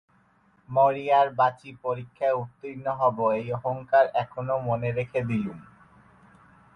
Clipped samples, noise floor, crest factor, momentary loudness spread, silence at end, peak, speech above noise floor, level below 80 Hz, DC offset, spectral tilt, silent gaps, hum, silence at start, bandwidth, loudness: under 0.1%; -63 dBFS; 18 dB; 11 LU; 1.1 s; -10 dBFS; 37 dB; -62 dBFS; under 0.1%; -8.5 dB/octave; none; none; 0.7 s; 6.2 kHz; -26 LUFS